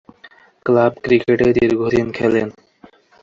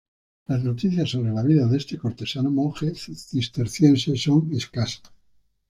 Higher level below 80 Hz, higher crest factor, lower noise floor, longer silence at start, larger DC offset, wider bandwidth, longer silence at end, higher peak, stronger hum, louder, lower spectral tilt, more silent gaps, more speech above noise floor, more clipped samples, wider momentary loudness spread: first, -48 dBFS vs -56 dBFS; about the same, 16 dB vs 18 dB; second, -48 dBFS vs -61 dBFS; first, 0.65 s vs 0.5 s; neither; second, 7.4 kHz vs 13.5 kHz; about the same, 0.7 s vs 0.75 s; about the same, -2 dBFS vs -4 dBFS; neither; first, -16 LUFS vs -23 LUFS; about the same, -7.5 dB/octave vs -6.5 dB/octave; neither; second, 33 dB vs 39 dB; neither; second, 6 LU vs 11 LU